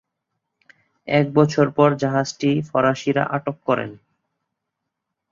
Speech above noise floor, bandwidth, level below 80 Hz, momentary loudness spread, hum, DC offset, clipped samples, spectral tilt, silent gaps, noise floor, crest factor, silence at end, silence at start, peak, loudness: 61 dB; 7.6 kHz; -60 dBFS; 7 LU; none; under 0.1%; under 0.1%; -6.5 dB/octave; none; -80 dBFS; 20 dB; 1.35 s; 1.05 s; -2 dBFS; -20 LUFS